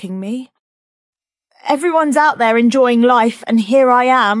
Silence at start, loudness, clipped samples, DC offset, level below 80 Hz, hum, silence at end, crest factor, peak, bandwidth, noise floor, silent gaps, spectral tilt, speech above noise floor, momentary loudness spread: 0 s; -13 LUFS; under 0.1%; under 0.1%; -70 dBFS; none; 0 s; 14 dB; 0 dBFS; 12 kHz; -56 dBFS; 0.59-1.13 s; -5 dB/octave; 43 dB; 13 LU